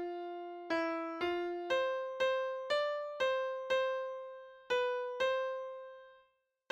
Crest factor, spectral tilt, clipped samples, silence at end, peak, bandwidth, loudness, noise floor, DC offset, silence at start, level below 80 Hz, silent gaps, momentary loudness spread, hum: 14 dB; -3 dB/octave; under 0.1%; 0.55 s; -22 dBFS; 8.6 kHz; -36 LUFS; -74 dBFS; under 0.1%; 0 s; -78 dBFS; none; 12 LU; none